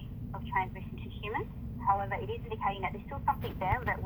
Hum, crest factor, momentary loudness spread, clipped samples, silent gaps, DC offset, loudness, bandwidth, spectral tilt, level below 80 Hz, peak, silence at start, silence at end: none; 18 dB; 10 LU; under 0.1%; none; under 0.1%; -35 LUFS; over 20 kHz; -8.5 dB/octave; -46 dBFS; -16 dBFS; 0 s; 0 s